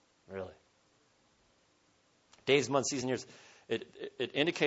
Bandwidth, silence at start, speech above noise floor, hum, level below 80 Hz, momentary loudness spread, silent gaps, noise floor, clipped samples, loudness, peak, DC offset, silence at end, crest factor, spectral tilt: 8 kHz; 0.3 s; 38 dB; none; -76 dBFS; 19 LU; none; -71 dBFS; under 0.1%; -34 LUFS; -12 dBFS; under 0.1%; 0 s; 24 dB; -3.5 dB/octave